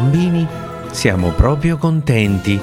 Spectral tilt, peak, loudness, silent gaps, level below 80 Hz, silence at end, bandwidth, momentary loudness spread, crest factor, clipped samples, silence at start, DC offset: -6.5 dB/octave; 0 dBFS; -16 LUFS; none; -26 dBFS; 0 s; 15.5 kHz; 7 LU; 14 dB; under 0.1%; 0 s; under 0.1%